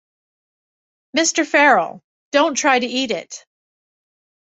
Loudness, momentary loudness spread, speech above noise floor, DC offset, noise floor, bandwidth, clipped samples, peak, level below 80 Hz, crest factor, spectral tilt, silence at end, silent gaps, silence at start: -17 LUFS; 15 LU; over 73 dB; under 0.1%; under -90 dBFS; 8.2 kHz; under 0.1%; 0 dBFS; -70 dBFS; 20 dB; -1.5 dB/octave; 1.1 s; 2.04-2.32 s; 1.15 s